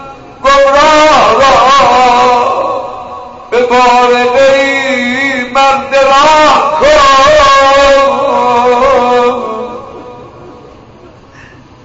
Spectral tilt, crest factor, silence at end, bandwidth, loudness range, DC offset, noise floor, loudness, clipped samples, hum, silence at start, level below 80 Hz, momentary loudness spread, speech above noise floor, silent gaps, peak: -3 dB/octave; 8 dB; 0.75 s; 8 kHz; 5 LU; under 0.1%; -35 dBFS; -6 LUFS; under 0.1%; none; 0 s; -34 dBFS; 13 LU; 29 dB; none; 0 dBFS